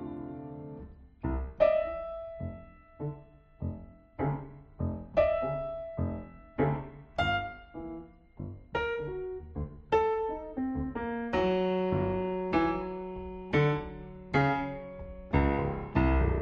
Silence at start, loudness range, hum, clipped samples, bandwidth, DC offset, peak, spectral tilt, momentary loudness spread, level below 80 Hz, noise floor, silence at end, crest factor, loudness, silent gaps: 0 s; 4 LU; none; under 0.1%; 7 kHz; under 0.1%; -12 dBFS; -6 dB/octave; 16 LU; -42 dBFS; -52 dBFS; 0 s; 20 dB; -32 LUFS; none